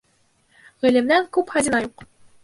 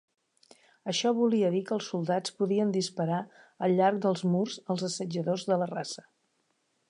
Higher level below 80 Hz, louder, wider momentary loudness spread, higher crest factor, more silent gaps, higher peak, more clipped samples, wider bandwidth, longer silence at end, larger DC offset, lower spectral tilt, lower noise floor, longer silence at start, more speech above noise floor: first, -58 dBFS vs -80 dBFS; first, -20 LUFS vs -29 LUFS; second, 6 LU vs 9 LU; about the same, 18 dB vs 18 dB; neither; first, -4 dBFS vs -12 dBFS; neither; about the same, 11.5 kHz vs 11 kHz; second, 0.4 s vs 0.95 s; neither; second, -3.5 dB/octave vs -5.5 dB/octave; second, -63 dBFS vs -75 dBFS; about the same, 0.85 s vs 0.85 s; about the same, 43 dB vs 46 dB